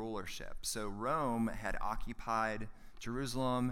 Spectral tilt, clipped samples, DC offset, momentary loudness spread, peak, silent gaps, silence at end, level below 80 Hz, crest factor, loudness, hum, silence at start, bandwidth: -4.5 dB/octave; under 0.1%; under 0.1%; 10 LU; -22 dBFS; none; 0 s; -48 dBFS; 16 dB; -38 LUFS; none; 0 s; 16 kHz